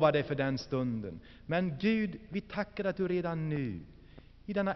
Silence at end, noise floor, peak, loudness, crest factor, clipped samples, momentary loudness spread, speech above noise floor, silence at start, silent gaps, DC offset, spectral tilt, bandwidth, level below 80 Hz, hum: 0 s; -55 dBFS; -14 dBFS; -34 LUFS; 20 dB; under 0.1%; 14 LU; 22 dB; 0 s; none; under 0.1%; -6 dB/octave; 6.2 kHz; -58 dBFS; none